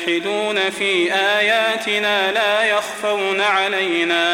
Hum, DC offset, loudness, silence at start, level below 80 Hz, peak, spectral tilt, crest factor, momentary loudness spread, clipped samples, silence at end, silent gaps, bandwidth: none; under 0.1%; -17 LUFS; 0 s; -64 dBFS; -6 dBFS; -2.5 dB/octave; 14 dB; 4 LU; under 0.1%; 0 s; none; 16.5 kHz